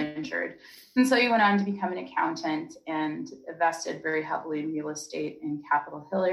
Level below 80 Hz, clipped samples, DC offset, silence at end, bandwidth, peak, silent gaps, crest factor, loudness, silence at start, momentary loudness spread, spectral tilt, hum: -74 dBFS; under 0.1%; under 0.1%; 0 s; 13.5 kHz; -12 dBFS; none; 16 dB; -28 LUFS; 0 s; 13 LU; -4.5 dB/octave; none